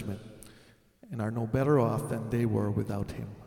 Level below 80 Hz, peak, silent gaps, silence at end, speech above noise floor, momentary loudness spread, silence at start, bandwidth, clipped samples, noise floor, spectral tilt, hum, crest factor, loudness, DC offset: -54 dBFS; -14 dBFS; none; 0 s; 30 dB; 17 LU; 0 s; 16.5 kHz; under 0.1%; -59 dBFS; -8 dB/octave; none; 18 dB; -30 LUFS; under 0.1%